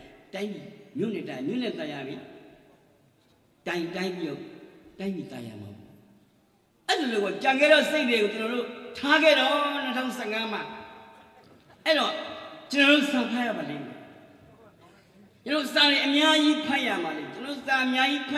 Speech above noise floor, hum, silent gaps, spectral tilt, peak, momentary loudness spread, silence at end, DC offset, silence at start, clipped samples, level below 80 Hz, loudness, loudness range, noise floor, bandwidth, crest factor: 39 dB; none; none; -3.5 dB/octave; -6 dBFS; 21 LU; 0 s; under 0.1%; 0 s; under 0.1%; -72 dBFS; -25 LUFS; 13 LU; -64 dBFS; 14.5 kHz; 20 dB